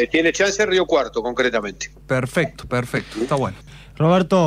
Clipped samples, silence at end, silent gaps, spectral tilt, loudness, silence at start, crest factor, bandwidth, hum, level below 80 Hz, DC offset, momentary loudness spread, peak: under 0.1%; 0 s; none; -5 dB/octave; -20 LUFS; 0 s; 14 dB; 15.5 kHz; none; -46 dBFS; under 0.1%; 9 LU; -6 dBFS